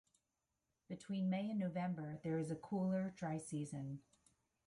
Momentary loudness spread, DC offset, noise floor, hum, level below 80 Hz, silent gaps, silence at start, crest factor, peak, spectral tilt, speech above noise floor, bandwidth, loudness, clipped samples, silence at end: 10 LU; under 0.1%; -89 dBFS; none; -78 dBFS; none; 0.9 s; 14 dB; -30 dBFS; -7.5 dB/octave; 47 dB; 11.5 kHz; -43 LUFS; under 0.1%; 0.7 s